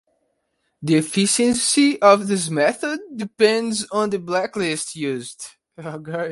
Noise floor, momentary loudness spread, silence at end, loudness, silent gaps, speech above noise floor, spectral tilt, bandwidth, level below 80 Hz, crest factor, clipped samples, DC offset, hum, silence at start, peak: -72 dBFS; 18 LU; 0 s; -19 LUFS; none; 52 dB; -3.5 dB/octave; 11.5 kHz; -62 dBFS; 20 dB; under 0.1%; under 0.1%; none; 0.8 s; 0 dBFS